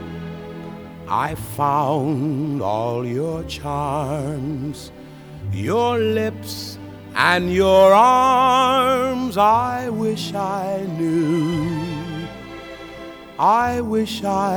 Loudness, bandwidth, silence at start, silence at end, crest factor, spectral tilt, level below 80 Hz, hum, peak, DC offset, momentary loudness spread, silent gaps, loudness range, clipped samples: -19 LUFS; over 20 kHz; 0 s; 0 s; 20 dB; -5.5 dB/octave; -46 dBFS; none; 0 dBFS; under 0.1%; 20 LU; none; 9 LU; under 0.1%